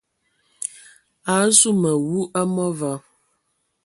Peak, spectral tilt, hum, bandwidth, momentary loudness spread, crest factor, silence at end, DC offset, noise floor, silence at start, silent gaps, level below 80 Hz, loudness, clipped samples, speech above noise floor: 0 dBFS; -3.5 dB/octave; none; 12 kHz; 17 LU; 22 dB; 0.85 s; under 0.1%; -71 dBFS; 0.6 s; none; -66 dBFS; -19 LUFS; under 0.1%; 52 dB